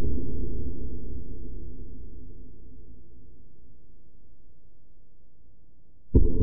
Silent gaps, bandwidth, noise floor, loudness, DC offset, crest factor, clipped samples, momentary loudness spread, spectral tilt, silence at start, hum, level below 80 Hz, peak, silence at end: none; 1.1 kHz; -58 dBFS; -33 LUFS; under 0.1%; 20 dB; under 0.1%; 28 LU; -16.5 dB/octave; 0 s; none; -34 dBFS; -6 dBFS; 0 s